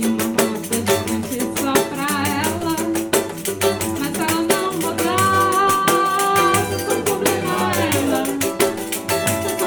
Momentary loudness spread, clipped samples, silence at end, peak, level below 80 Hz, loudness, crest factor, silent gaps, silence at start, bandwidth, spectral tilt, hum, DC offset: 6 LU; under 0.1%; 0 s; 0 dBFS; -52 dBFS; -19 LUFS; 18 dB; none; 0 s; 19.5 kHz; -3.5 dB/octave; none; under 0.1%